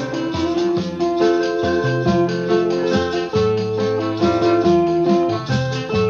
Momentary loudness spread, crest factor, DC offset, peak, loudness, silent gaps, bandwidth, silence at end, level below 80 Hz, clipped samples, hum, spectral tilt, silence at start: 5 LU; 14 dB; under 0.1%; -4 dBFS; -18 LUFS; none; 7.2 kHz; 0 s; -46 dBFS; under 0.1%; none; -6.5 dB/octave; 0 s